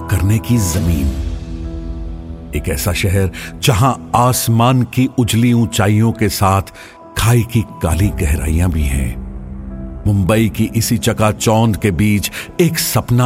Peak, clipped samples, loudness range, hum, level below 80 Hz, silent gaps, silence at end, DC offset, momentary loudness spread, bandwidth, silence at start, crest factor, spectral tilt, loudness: 0 dBFS; under 0.1%; 4 LU; none; -26 dBFS; none; 0 s; under 0.1%; 14 LU; 16.5 kHz; 0 s; 14 dB; -5.5 dB/octave; -15 LUFS